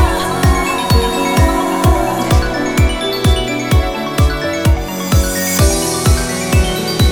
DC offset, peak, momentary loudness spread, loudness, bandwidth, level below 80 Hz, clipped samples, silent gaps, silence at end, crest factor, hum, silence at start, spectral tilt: under 0.1%; 0 dBFS; 3 LU; -14 LUFS; over 20 kHz; -18 dBFS; under 0.1%; none; 0 s; 14 dB; none; 0 s; -4.5 dB/octave